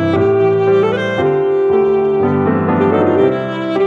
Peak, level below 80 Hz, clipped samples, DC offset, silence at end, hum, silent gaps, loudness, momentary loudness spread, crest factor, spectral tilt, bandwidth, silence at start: -2 dBFS; -50 dBFS; under 0.1%; under 0.1%; 0 s; none; none; -13 LUFS; 3 LU; 12 dB; -8.5 dB/octave; 6.6 kHz; 0 s